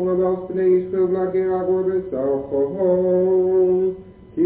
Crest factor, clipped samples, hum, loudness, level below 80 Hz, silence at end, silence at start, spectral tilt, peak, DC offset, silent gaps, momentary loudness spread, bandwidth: 10 dB; under 0.1%; none; -20 LUFS; -52 dBFS; 0 s; 0 s; -13 dB/octave; -8 dBFS; under 0.1%; none; 5 LU; 4 kHz